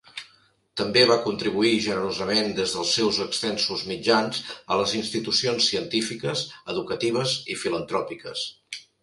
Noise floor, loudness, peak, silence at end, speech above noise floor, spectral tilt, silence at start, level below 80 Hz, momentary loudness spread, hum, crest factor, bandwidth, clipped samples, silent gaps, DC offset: -60 dBFS; -24 LUFS; -4 dBFS; 0.2 s; 36 dB; -3.5 dB/octave; 0.15 s; -60 dBFS; 11 LU; none; 22 dB; 11.5 kHz; under 0.1%; none; under 0.1%